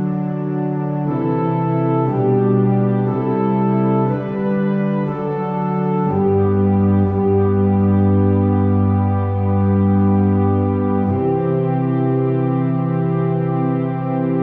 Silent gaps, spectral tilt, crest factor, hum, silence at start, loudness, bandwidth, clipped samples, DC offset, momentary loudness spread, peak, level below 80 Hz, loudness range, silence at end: none; -10.5 dB/octave; 12 dB; none; 0 s; -17 LUFS; 3.7 kHz; under 0.1%; under 0.1%; 6 LU; -4 dBFS; -50 dBFS; 3 LU; 0 s